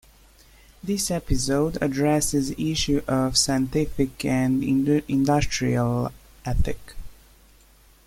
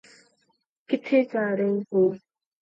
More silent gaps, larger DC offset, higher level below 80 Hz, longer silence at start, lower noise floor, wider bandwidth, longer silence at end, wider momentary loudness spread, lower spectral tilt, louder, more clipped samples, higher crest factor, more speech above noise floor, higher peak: neither; neither; first, -36 dBFS vs -78 dBFS; about the same, 0.85 s vs 0.9 s; second, -54 dBFS vs -71 dBFS; first, 16.5 kHz vs 7.8 kHz; first, 0.95 s vs 0.45 s; about the same, 8 LU vs 7 LU; second, -5 dB/octave vs -8 dB/octave; about the same, -23 LUFS vs -24 LUFS; neither; about the same, 18 dB vs 16 dB; second, 32 dB vs 48 dB; first, -6 dBFS vs -10 dBFS